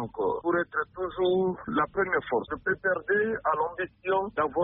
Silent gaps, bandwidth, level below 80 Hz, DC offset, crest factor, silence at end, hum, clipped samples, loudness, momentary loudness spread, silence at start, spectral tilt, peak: none; 3.9 kHz; -58 dBFS; under 0.1%; 14 dB; 0 s; none; under 0.1%; -28 LUFS; 5 LU; 0 s; -4 dB/octave; -14 dBFS